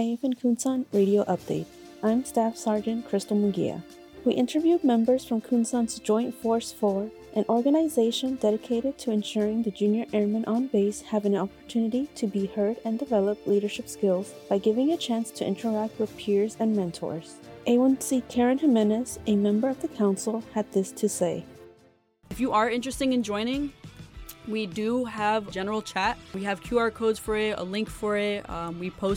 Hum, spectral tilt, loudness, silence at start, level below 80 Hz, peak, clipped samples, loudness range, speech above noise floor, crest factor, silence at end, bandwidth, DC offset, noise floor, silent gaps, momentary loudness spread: none; -5.5 dB/octave; -27 LUFS; 0 s; -56 dBFS; -12 dBFS; under 0.1%; 3 LU; 35 dB; 14 dB; 0 s; 17.5 kHz; under 0.1%; -60 dBFS; none; 9 LU